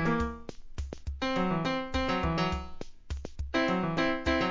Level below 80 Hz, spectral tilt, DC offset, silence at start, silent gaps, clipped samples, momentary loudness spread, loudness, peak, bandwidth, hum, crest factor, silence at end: -42 dBFS; -6 dB/octave; 0.2%; 0 s; none; under 0.1%; 14 LU; -31 LUFS; -14 dBFS; 7.6 kHz; none; 16 dB; 0 s